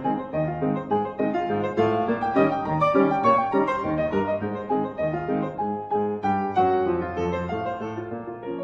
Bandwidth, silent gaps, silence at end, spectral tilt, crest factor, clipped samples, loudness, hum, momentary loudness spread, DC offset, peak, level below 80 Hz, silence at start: 7.4 kHz; none; 0 s; -8.5 dB/octave; 16 dB; under 0.1%; -24 LUFS; none; 9 LU; under 0.1%; -8 dBFS; -52 dBFS; 0 s